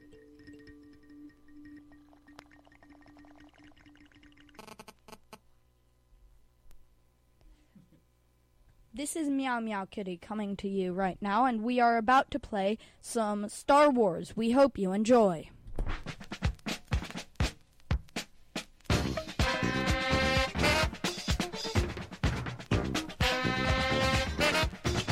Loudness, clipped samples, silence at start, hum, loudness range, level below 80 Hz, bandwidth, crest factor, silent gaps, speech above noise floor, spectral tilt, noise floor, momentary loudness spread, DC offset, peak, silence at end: -30 LUFS; under 0.1%; 0.1 s; 60 Hz at -60 dBFS; 10 LU; -42 dBFS; 16 kHz; 20 dB; none; 39 dB; -5 dB/octave; -68 dBFS; 15 LU; under 0.1%; -12 dBFS; 0 s